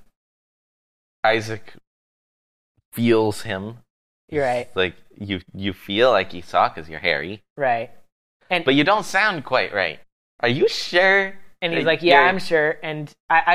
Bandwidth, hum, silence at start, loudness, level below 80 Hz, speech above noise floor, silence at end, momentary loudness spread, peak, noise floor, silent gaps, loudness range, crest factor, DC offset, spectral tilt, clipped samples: 15 kHz; none; 1.25 s; -20 LUFS; -60 dBFS; over 70 dB; 0 s; 14 LU; 0 dBFS; under -90 dBFS; 1.87-2.75 s, 2.85-2.92 s, 3.90-4.28 s, 7.50-7.56 s, 8.12-8.40 s, 10.12-10.39 s, 13.20-13.29 s; 6 LU; 22 dB; under 0.1%; -5 dB/octave; under 0.1%